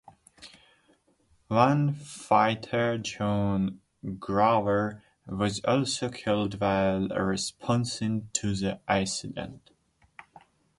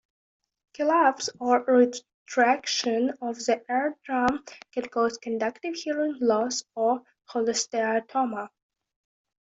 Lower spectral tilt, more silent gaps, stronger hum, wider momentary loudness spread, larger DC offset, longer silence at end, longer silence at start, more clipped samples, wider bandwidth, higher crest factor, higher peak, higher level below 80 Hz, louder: first, -5 dB/octave vs -2.5 dB/octave; second, none vs 2.14-2.26 s; neither; first, 14 LU vs 10 LU; neither; first, 1.2 s vs 1 s; second, 0.4 s vs 0.8 s; neither; first, 11.5 kHz vs 8 kHz; about the same, 22 dB vs 20 dB; about the same, -6 dBFS vs -8 dBFS; first, -54 dBFS vs -70 dBFS; about the same, -27 LUFS vs -26 LUFS